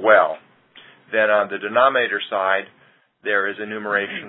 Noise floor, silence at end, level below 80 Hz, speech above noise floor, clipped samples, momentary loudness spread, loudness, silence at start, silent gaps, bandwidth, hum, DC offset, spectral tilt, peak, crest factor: -49 dBFS; 0 s; -72 dBFS; 29 dB; under 0.1%; 9 LU; -20 LUFS; 0 s; none; 4.1 kHz; none; under 0.1%; -8.5 dB/octave; -2 dBFS; 20 dB